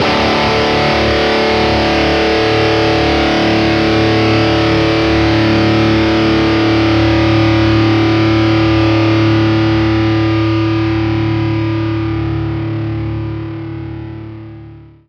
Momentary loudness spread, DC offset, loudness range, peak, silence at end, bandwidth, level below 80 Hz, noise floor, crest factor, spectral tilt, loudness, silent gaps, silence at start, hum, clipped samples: 9 LU; under 0.1%; 6 LU; 0 dBFS; 0.25 s; 8 kHz; -28 dBFS; -35 dBFS; 12 dB; -6.5 dB/octave; -12 LUFS; none; 0 s; none; under 0.1%